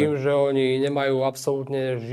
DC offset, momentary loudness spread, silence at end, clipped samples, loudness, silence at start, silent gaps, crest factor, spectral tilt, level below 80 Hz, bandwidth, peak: under 0.1%; 6 LU; 0 s; under 0.1%; -23 LUFS; 0 s; none; 14 dB; -6 dB/octave; -68 dBFS; 14 kHz; -8 dBFS